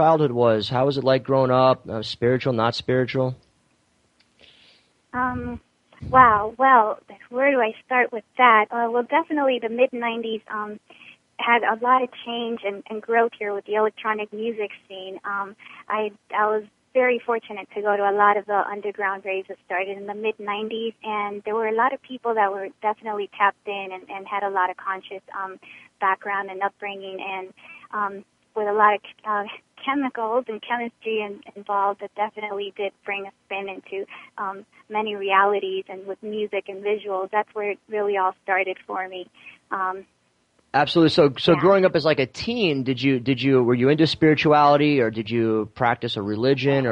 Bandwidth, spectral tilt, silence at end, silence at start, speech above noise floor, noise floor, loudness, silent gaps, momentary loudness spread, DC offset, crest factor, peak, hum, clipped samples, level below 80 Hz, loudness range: 9.2 kHz; -7 dB/octave; 0 s; 0 s; 43 dB; -65 dBFS; -22 LUFS; none; 15 LU; under 0.1%; 22 dB; 0 dBFS; none; under 0.1%; -58 dBFS; 8 LU